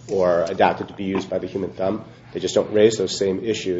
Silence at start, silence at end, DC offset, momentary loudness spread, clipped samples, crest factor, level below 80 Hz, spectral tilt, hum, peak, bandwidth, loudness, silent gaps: 0 s; 0 s; under 0.1%; 11 LU; under 0.1%; 20 dB; -56 dBFS; -5 dB/octave; none; -2 dBFS; 8 kHz; -21 LUFS; none